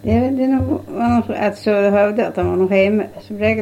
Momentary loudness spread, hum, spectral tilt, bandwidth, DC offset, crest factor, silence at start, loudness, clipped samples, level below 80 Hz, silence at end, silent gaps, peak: 6 LU; none; -8 dB/octave; 15 kHz; under 0.1%; 14 dB; 0.05 s; -17 LUFS; under 0.1%; -40 dBFS; 0 s; none; -2 dBFS